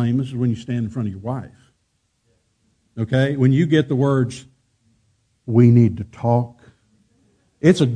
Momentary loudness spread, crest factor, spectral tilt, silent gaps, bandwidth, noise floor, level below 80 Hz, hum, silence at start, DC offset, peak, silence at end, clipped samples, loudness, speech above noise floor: 15 LU; 20 dB; -8 dB/octave; none; 9.8 kHz; -68 dBFS; -54 dBFS; none; 0 s; under 0.1%; 0 dBFS; 0 s; under 0.1%; -19 LUFS; 51 dB